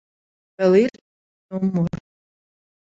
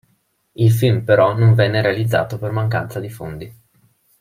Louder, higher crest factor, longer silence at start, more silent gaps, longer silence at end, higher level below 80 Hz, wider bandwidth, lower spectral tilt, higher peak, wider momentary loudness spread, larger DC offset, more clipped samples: second, -20 LUFS vs -17 LUFS; about the same, 18 dB vs 16 dB; about the same, 0.6 s vs 0.6 s; first, 1.01-1.49 s vs none; first, 0.95 s vs 0.7 s; about the same, -56 dBFS vs -52 dBFS; second, 7.8 kHz vs 15.5 kHz; first, -8.5 dB/octave vs -7 dB/octave; second, -4 dBFS vs 0 dBFS; about the same, 15 LU vs 17 LU; neither; neither